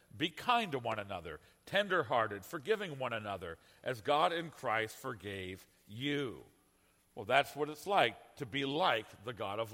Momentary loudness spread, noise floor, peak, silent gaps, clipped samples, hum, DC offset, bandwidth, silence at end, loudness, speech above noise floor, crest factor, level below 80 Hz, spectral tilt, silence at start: 15 LU; -71 dBFS; -12 dBFS; none; under 0.1%; none; under 0.1%; 16.5 kHz; 0 s; -36 LUFS; 35 dB; 24 dB; -72 dBFS; -4.5 dB/octave; 0.15 s